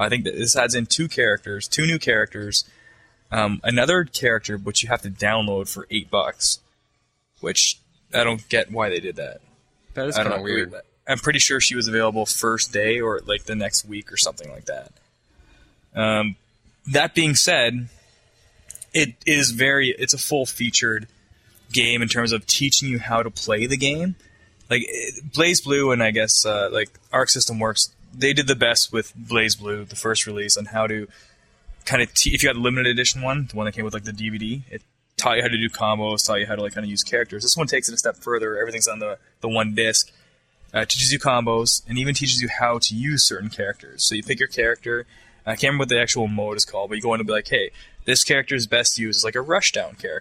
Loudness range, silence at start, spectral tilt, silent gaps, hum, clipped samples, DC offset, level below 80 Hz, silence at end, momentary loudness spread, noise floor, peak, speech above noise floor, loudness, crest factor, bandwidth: 4 LU; 0 s; -2.5 dB/octave; none; none; under 0.1%; under 0.1%; -46 dBFS; 0 s; 11 LU; -68 dBFS; 0 dBFS; 47 dB; -20 LUFS; 22 dB; 16 kHz